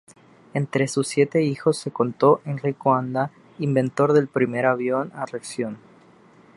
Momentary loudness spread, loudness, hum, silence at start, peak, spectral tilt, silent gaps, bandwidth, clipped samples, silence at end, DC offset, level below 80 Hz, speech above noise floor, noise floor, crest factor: 11 LU; -23 LUFS; none; 0.55 s; -4 dBFS; -6.5 dB/octave; none; 11.5 kHz; under 0.1%; 0.8 s; under 0.1%; -68 dBFS; 30 dB; -52 dBFS; 18 dB